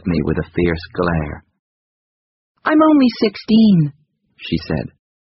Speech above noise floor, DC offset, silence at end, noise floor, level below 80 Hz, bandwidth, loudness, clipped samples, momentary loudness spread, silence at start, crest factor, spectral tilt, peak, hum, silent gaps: over 75 dB; under 0.1%; 0.45 s; under -90 dBFS; -38 dBFS; 6 kHz; -16 LUFS; under 0.1%; 14 LU; 0.05 s; 16 dB; -6 dB/octave; -2 dBFS; none; 1.59-2.55 s